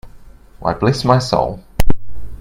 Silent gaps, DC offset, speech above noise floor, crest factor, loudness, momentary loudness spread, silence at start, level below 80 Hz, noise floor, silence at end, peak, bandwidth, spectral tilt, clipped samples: none; under 0.1%; 23 dB; 14 dB; -18 LUFS; 11 LU; 0.05 s; -26 dBFS; -39 dBFS; 0.05 s; 0 dBFS; 16 kHz; -6 dB/octave; under 0.1%